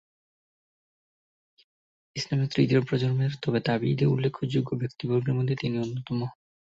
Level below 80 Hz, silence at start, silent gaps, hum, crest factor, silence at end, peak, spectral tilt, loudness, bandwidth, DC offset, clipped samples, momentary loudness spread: -60 dBFS; 2.15 s; none; none; 18 dB; 0.45 s; -10 dBFS; -7.5 dB/octave; -27 LUFS; 7.6 kHz; under 0.1%; under 0.1%; 8 LU